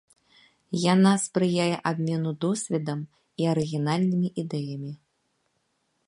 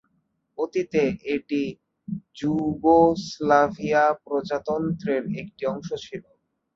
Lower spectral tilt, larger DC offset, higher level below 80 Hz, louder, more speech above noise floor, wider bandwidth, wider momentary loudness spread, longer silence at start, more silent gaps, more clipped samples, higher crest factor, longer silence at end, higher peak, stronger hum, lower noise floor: about the same, -6 dB/octave vs -6.5 dB/octave; neither; second, -70 dBFS vs -56 dBFS; about the same, -26 LUFS vs -24 LUFS; about the same, 49 dB vs 48 dB; first, 11.5 kHz vs 7.6 kHz; second, 14 LU vs 17 LU; about the same, 0.7 s vs 0.6 s; neither; neither; about the same, 18 dB vs 18 dB; first, 1.15 s vs 0.55 s; about the same, -8 dBFS vs -6 dBFS; neither; about the same, -74 dBFS vs -71 dBFS